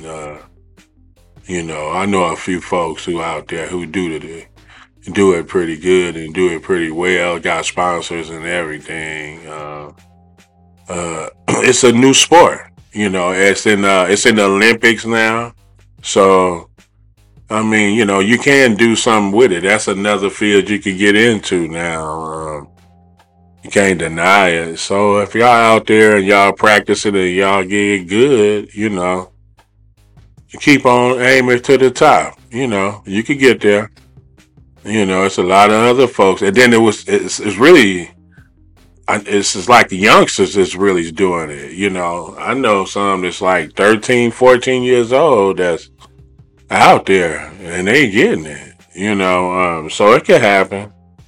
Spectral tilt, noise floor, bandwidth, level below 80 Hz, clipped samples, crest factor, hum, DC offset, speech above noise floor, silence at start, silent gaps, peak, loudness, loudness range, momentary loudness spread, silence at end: -4 dB/octave; -49 dBFS; 16.5 kHz; -48 dBFS; 0.4%; 14 dB; none; under 0.1%; 37 dB; 0 s; none; 0 dBFS; -12 LUFS; 8 LU; 14 LU; 0.4 s